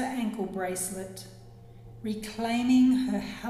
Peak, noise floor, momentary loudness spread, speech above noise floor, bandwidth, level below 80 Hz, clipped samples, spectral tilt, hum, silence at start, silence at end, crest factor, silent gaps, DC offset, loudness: -14 dBFS; -48 dBFS; 18 LU; 21 dB; 15 kHz; -56 dBFS; under 0.1%; -4.5 dB/octave; none; 0 s; 0 s; 14 dB; none; under 0.1%; -28 LUFS